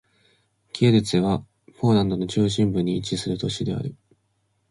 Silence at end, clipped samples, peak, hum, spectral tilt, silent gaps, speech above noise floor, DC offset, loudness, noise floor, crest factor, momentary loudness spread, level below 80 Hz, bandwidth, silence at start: 0.75 s; under 0.1%; -6 dBFS; none; -6.5 dB/octave; none; 48 dB; under 0.1%; -23 LUFS; -70 dBFS; 18 dB; 9 LU; -50 dBFS; 11.5 kHz; 0.75 s